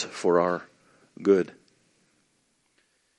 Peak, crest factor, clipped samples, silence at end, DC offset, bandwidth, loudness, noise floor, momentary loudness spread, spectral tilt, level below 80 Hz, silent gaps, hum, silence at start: -8 dBFS; 20 dB; under 0.1%; 1.7 s; under 0.1%; 10.5 kHz; -25 LUFS; -70 dBFS; 10 LU; -6 dB/octave; -76 dBFS; none; none; 0 s